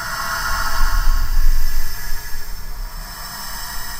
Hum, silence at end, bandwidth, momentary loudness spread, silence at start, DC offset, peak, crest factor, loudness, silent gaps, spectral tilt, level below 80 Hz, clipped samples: none; 0 s; 16 kHz; 11 LU; 0 s; under 0.1%; -2 dBFS; 14 dB; -25 LUFS; none; -2 dB/octave; -18 dBFS; under 0.1%